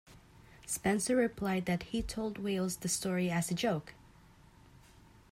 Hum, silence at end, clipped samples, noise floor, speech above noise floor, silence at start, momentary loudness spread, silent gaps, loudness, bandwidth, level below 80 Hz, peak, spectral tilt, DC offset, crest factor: none; 1.35 s; under 0.1%; -60 dBFS; 26 dB; 0.1 s; 8 LU; none; -34 LUFS; 16 kHz; -56 dBFS; -20 dBFS; -4.5 dB/octave; under 0.1%; 16 dB